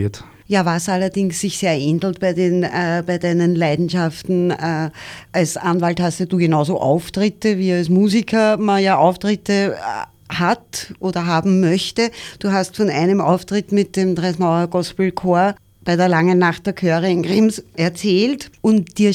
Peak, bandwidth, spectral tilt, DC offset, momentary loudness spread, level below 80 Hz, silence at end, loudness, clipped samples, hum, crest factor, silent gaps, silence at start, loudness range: -2 dBFS; 15 kHz; -6 dB/octave; under 0.1%; 7 LU; -52 dBFS; 0 s; -18 LUFS; under 0.1%; none; 14 dB; none; 0 s; 3 LU